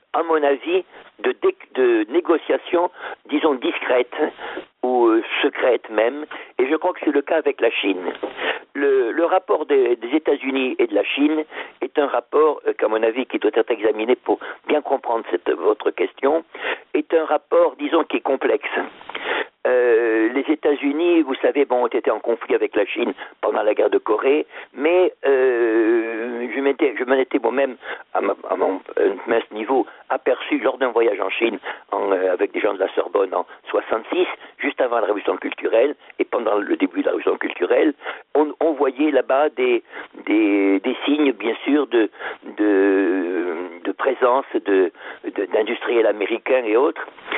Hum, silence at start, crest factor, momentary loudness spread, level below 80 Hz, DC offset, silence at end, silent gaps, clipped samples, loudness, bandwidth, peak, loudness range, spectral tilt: none; 0.15 s; 14 dB; 7 LU; -70 dBFS; under 0.1%; 0 s; none; under 0.1%; -20 LUFS; 4 kHz; -6 dBFS; 2 LU; -1 dB/octave